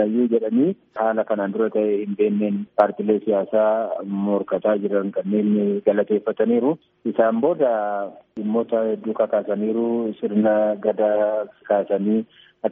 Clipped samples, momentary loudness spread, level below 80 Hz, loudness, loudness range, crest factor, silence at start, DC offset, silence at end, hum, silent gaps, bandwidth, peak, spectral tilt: under 0.1%; 5 LU; -72 dBFS; -21 LUFS; 1 LU; 18 dB; 0 s; under 0.1%; 0 s; none; none; 3.8 kHz; -2 dBFS; -7 dB/octave